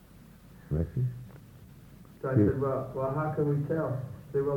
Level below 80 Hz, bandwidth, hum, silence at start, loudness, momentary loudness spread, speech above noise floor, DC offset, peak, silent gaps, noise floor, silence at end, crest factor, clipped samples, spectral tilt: -50 dBFS; 18.5 kHz; none; 0.15 s; -31 LUFS; 12 LU; 24 dB; under 0.1%; -12 dBFS; none; -53 dBFS; 0 s; 18 dB; under 0.1%; -10.5 dB/octave